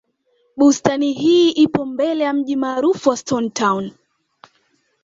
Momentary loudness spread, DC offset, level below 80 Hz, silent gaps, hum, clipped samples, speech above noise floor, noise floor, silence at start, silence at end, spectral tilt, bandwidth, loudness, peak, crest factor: 7 LU; under 0.1%; -58 dBFS; none; none; under 0.1%; 47 dB; -63 dBFS; 0.55 s; 1.15 s; -4.5 dB/octave; 7.8 kHz; -17 LUFS; -2 dBFS; 16 dB